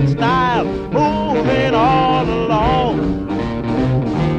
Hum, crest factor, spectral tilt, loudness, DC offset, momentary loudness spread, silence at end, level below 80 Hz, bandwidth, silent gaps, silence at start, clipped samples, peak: none; 12 dB; -7.5 dB/octave; -16 LUFS; under 0.1%; 6 LU; 0 s; -32 dBFS; 8.8 kHz; none; 0 s; under 0.1%; -2 dBFS